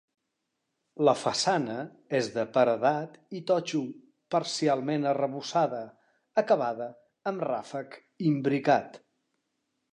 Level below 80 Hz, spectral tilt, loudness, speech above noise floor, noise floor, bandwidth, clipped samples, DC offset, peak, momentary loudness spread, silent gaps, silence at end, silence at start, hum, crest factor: -78 dBFS; -5 dB/octave; -28 LUFS; 54 dB; -82 dBFS; 11 kHz; under 0.1%; under 0.1%; -8 dBFS; 14 LU; none; 0.95 s; 0.95 s; none; 20 dB